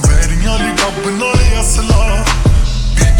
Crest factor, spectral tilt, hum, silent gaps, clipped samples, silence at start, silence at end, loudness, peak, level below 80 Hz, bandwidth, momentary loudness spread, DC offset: 10 dB; -4.5 dB/octave; none; none; under 0.1%; 0 s; 0 s; -13 LUFS; 0 dBFS; -12 dBFS; 18 kHz; 3 LU; under 0.1%